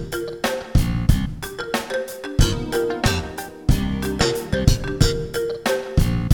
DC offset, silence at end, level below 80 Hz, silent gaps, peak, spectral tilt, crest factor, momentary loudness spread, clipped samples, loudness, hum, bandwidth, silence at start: under 0.1%; 0 s; -26 dBFS; none; 0 dBFS; -5.5 dB/octave; 20 dB; 6 LU; under 0.1%; -22 LUFS; none; 19.5 kHz; 0 s